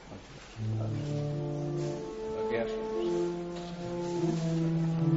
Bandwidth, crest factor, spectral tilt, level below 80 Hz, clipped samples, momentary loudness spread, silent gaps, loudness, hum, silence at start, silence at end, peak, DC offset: 8 kHz; 14 dB; -7.5 dB/octave; -56 dBFS; under 0.1%; 9 LU; none; -33 LUFS; none; 0 s; 0 s; -18 dBFS; under 0.1%